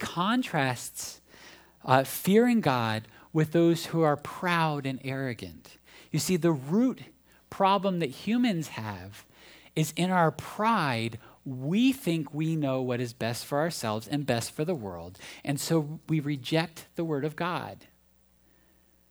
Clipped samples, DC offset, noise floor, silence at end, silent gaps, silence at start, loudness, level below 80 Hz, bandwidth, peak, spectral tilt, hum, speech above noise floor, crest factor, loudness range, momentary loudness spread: under 0.1%; under 0.1%; -64 dBFS; 1.35 s; none; 0 s; -28 LUFS; -66 dBFS; over 20 kHz; -6 dBFS; -5.5 dB/octave; none; 36 dB; 22 dB; 5 LU; 14 LU